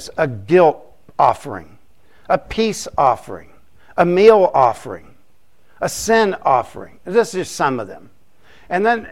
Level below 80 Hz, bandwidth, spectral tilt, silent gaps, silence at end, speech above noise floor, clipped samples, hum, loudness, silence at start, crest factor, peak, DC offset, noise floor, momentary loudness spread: -48 dBFS; 16 kHz; -5 dB/octave; none; 0 s; 43 dB; under 0.1%; none; -16 LUFS; 0 s; 18 dB; 0 dBFS; 0.7%; -60 dBFS; 21 LU